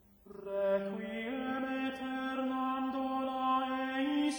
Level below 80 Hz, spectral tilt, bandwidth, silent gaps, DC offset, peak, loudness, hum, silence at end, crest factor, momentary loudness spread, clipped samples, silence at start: -70 dBFS; -5 dB/octave; over 20 kHz; none; under 0.1%; -20 dBFS; -35 LUFS; none; 0 s; 14 dB; 7 LU; under 0.1%; 0.25 s